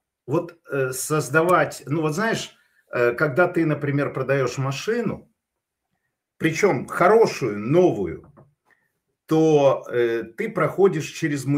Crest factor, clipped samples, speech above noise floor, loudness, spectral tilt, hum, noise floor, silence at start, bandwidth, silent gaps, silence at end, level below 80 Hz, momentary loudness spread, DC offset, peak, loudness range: 18 dB; under 0.1%; 60 dB; -22 LUFS; -6 dB/octave; none; -81 dBFS; 0.25 s; 16 kHz; none; 0 s; -62 dBFS; 10 LU; under 0.1%; -4 dBFS; 3 LU